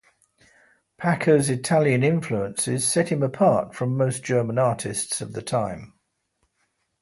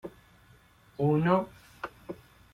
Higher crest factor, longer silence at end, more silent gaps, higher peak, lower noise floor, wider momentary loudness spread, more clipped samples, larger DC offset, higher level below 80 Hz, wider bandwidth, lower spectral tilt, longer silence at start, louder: about the same, 18 dB vs 22 dB; first, 1.15 s vs 0.4 s; neither; first, -6 dBFS vs -10 dBFS; first, -73 dBFS vs -59 dBFS; second, 8 LU vs 22 LU; neither; neither; about the same, -60 dBFS vs -62 dBFS; second, 12 kHz vs 14.5 kHz; second, -5 dB/octave vs -9 dB/octave; first, 1 s vs 0.05 s; first, -23 LUFS vs -28 LUFS